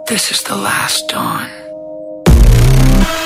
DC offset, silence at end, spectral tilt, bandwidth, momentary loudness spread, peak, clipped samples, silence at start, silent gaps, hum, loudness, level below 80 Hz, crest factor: under 0.1%; 0 s; -4.5 dB/octave; 16 kHz; 19 LU; 0 dBFS; under 0.1%; 0 s; none; none; -12 LUFS; -14 dBFS; 12 dB